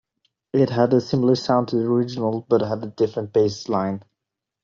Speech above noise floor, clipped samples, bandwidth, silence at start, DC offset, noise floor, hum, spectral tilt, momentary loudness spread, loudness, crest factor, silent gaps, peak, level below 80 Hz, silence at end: 64 dB; under 0.1%; 7.4 kHz; 0.55 s; under 0.1%; -84 dBFS; none; -7.5 dB/octave; 7 LU; -21 LUFS; 18 dB; none; -4 dBFS; -60 dBFS; 0.65 s